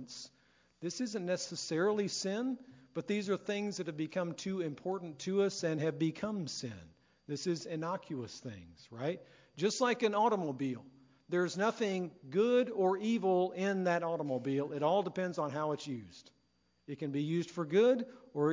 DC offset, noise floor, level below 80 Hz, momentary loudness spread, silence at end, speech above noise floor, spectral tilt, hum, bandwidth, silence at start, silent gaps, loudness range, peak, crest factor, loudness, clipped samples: under 0.1%; -75 dBFS; -76 dBFS; 15 LU; 0 s; 41 dB; -5.5 dB/octave; none; 7.6 kHz; 0 s; none; 5 LU; -18 dBFS; 18 dB; -35 LUFS; under 0.1%